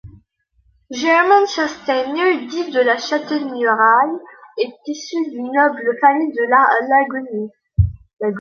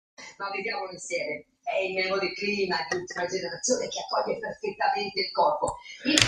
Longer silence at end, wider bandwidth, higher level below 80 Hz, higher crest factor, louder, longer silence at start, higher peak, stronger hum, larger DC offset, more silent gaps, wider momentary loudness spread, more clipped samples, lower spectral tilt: about the same, 0 s vs 0 s; second, 7.2 kHz vs 13.5 kHz; first, -36 dBFS vs -58 dBFS; second, 16 dB vs 28 dB; first, -17 LUFS vs -29 LUFS; second, 0.05 s vs 0.2 s; about the same, -2 dBFS vs -2 dBFS; neither; neither; first, 8.13-8.17 s vs none; first, 12 LU vs 9 LU; neither; first, -5.5 dB/octave vs -2.5 dB/octave